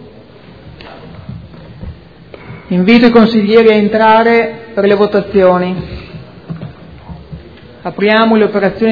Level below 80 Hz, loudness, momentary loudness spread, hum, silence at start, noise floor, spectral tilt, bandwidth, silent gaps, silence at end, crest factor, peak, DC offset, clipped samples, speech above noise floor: -40 dBFS; -10 LUFS; 24 LU; none; 0 s; -36 dBFS; -8.5 dB/octave; 5.4 kHz; none; 0 s; 12 dB; 0 dBFS; 0.4%; 0.5%; 28 dB